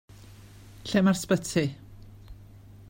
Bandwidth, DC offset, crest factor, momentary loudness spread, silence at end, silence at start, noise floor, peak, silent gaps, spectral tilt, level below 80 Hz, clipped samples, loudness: 16.5 kHz; under 0.1%; 20 dB; 16 LU; 0.05 s; 0.3 s; -49 dBFS; -10 dBFS; none; -5.5 dB/octave; -54 dBFS; under 0.1%; -26 LUFS